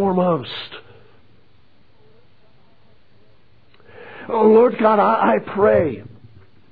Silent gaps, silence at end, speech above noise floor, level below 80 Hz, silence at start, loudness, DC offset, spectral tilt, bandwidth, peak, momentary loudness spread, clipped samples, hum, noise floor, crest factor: none; 0.7 s; 41 dB; -58 dBFS; 0 s; -16 LUFS; 0.5%; -10 dB/octave; 5 kHz; -4 dBFS; 22 LU; under 0.1%; none; -57 dBFS; 16 dB